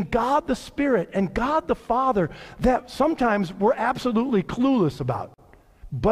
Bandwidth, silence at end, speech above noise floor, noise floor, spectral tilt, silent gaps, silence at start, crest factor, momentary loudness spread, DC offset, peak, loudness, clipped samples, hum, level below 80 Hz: 14 kHz; 0 s; 26 dB; -49 dBFS; -7 dB/octave; none; 0 s; 16 dB; 7 LU; under 0.1%; -8 dBFS; -23 LUFS; under 0.1%; none; -42 dBFS